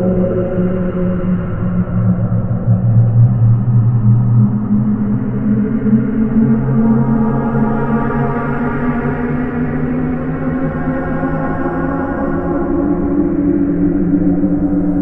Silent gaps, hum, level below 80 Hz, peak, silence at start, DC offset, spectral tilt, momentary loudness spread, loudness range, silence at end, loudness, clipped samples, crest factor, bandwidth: none; none; -28 dBFS; 0 dBFS; 0 s; under 0.1%; -12.5 dB/octave; 6 LU; 5 LU; 0 s; -15 LUFS; under 0.1%; 14 dB; 3.1 kHz